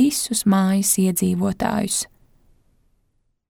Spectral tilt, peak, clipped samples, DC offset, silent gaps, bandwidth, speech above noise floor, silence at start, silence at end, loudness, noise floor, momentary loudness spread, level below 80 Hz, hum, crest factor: -4.5 dB/octave; -6 dBFS; under 0.1%; under 0.1%; none; 19 kHz; 47 dB; 0 s; 1.45 s; -20 LUFS; -67 dBFS; 6 LU; -52 dBFS; none; 16 dB